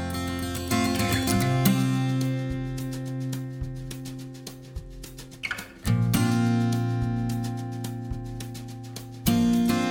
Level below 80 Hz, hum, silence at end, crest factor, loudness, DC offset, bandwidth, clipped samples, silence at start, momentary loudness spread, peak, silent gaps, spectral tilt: -44 dBFS; none; 0 s; 24 dB; -27 LUFS; under 0.1%; over 20 kHz; under 0.1%; 0 s; 16 LU; -2 dBFS; none; -5.5 dB/octave